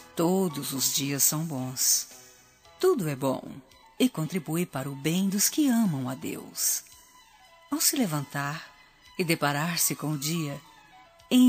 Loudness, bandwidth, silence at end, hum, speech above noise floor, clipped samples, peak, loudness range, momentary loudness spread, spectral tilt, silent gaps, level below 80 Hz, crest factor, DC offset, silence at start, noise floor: -27 LUFS; 15.5 kHz; 0 s; none; 28 dB; under 0.1%; -8 dBFS; 3 LU; 12 LU; -3.5 dB/octave; none; -68 dBFS; 20 dB; under 0.1%; 0 s; -56 dBFS